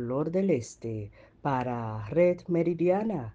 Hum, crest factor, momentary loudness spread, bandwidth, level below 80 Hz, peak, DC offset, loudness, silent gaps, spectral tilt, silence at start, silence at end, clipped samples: none; 16 dB; 12 LU; 9.2 kHz; -58 dBFS; -12 dBFS; under 0.1%; -29 LUFS; none; -8 dB/octave; 0 s; 0 s; under 0.1%